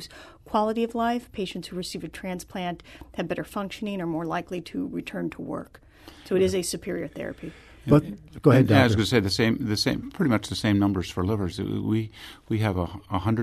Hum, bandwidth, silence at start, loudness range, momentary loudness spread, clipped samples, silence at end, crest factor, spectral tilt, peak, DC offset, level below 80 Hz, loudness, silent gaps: none; 13.5 kHz; 0 s; 10 LU; 14 LU; under 0.1%; 0 s; 22 dB; -6 dB/octave; -4 dBFS; under 0.1%; -50 dBFS; -26 LUFS; none